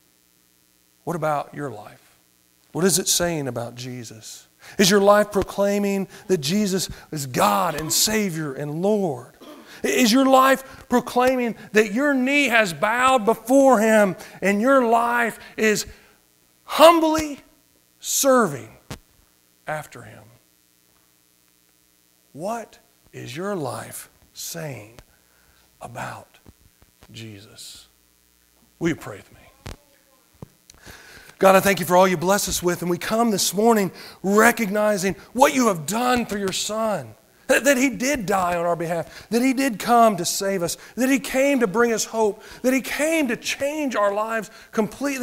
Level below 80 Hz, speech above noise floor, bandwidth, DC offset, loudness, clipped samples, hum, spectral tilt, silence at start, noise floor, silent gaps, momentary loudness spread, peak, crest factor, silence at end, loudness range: -54 dBFS; 40 dB; 16 kHz; under 0.1%; -20 LUFS; under 0.1%; none; -3.5 dB/octave; 1.05 s; -60 dBFS; none; 20 LU; 0 dBFS; 22 dB; 0 s; 17 LU